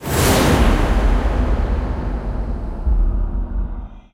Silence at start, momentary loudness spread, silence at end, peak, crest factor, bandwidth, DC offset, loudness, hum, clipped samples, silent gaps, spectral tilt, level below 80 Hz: 0 s; 12 LU; 0.15 s; -4 dBFS; 14 dB; 16 kHz; under 0.1%; -20 LUFS; none; under 0.1%; none; -5.5 dB/octave; -18 dBFS